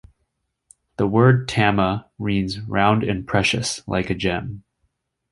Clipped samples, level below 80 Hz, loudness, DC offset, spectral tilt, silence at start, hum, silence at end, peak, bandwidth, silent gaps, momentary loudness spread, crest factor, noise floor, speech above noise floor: under 0.1%; -44 dBFS; -20 LUFS; under 0.1%; -5.5 dB/octave; 1 s; none; 0.7 s; -2 dBFS; 11.5 kHz; none; 10 LU; 20 dB; -73 dBFS; 54 dB